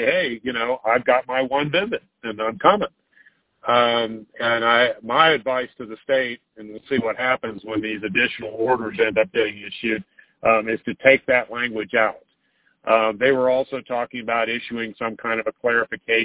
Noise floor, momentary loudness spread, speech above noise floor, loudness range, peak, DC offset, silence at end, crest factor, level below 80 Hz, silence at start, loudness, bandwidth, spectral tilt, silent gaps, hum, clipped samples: -65 dBFS; 11 LU; 44 dB; 3 LU; 0 dBFS; under 0.1%; 0 s; 22 dB; -60 dBFS; 0 s; -21 LUFS; 4 kHz; -8 dB/octave; none; none; under 0.1%